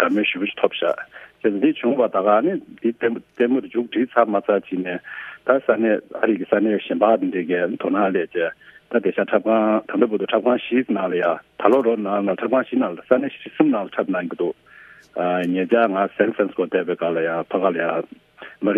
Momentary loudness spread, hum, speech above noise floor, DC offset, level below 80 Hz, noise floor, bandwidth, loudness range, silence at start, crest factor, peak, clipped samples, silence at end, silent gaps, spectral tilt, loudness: 8 LU; none; 27 dB; under 0.1%; -70 dBFS; -47 dBFS; 3.9 kHz; 2 LU; 0 s; 20 dB; 0 dBFS; under 0.1%; 0 s; none; -8 dB/octave; -21 LUFS